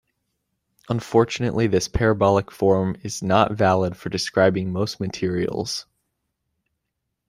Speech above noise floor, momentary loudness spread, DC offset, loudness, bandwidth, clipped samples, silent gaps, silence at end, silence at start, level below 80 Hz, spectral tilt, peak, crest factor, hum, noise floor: 58 dB; 8 LU; under 0.1%; -22 LUFS; 15.5 kHz; under 0.1%; none; 1.45 s; 0.9 s; -44 dBFS; -5.5 dB/octave; -2 dBFS; 20 dB; none; -79 dBFS